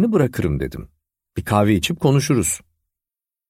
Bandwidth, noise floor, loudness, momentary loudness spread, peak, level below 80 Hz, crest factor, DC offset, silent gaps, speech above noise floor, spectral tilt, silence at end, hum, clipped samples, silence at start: 16 kHz; -89 dBFS; -19 LUFS; 13 LU; -2 dBFS; -40 dBFS; 18 dB; under 0.1%; none; 71 dB; -5.5 dB/octave; 0.9 s; none; under 0.1%; 0 s